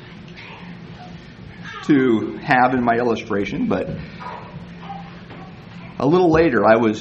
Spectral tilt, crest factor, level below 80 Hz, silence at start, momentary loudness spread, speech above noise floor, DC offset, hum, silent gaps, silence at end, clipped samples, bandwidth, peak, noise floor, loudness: -7.5 dB/octave; 20 dB; -46 dBFS; 0 s; 23 LU; 21 dB; under 0.1%; none; none; 0 s; under 0.1%; 8 kHz; 0 dBFS; -38 dBFS; -18 LUFS